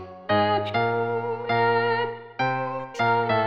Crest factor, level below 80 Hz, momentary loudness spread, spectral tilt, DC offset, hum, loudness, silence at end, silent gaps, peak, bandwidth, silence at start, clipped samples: 14 dB; -64 dBFS; 7 LU; -6.5 dB/octave; 0.2%; none; -24 LUFS; 0 s; none; -10 dBFS; 7.6 kHz; 0 s; under 0.1%